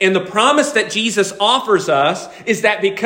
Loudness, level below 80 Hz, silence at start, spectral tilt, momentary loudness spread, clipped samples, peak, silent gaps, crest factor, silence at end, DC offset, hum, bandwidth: -15 LUFS; -64 dBFS; 0 s; -3 dB/octave; 4 LU; under 0.1%; 0 dBFS; none; 14 dB; 0 s; under 0.1%; none; 16.5 kHz